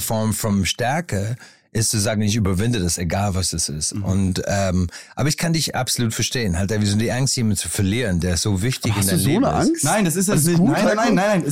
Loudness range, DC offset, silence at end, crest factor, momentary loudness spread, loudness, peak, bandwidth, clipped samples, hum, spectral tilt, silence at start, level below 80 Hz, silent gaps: 3 LU; 0.3%; 0 s; 12 dB; 5 LU; -20 LUFS; -8 dBFS; 16 kHz; under 0.1%; none; -4.5 dB/octave; 0 s; -44 dBFS; none